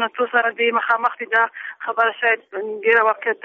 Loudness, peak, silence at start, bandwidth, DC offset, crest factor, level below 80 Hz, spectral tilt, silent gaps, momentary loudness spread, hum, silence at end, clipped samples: -19 LUFS; -4 dBFS; 0 s; 5 kHz; under 0.1%; 16 dB; -76 dBFS; 1.5 dB/octave; none; 7 LU; none; 0.1 s; under 0.1%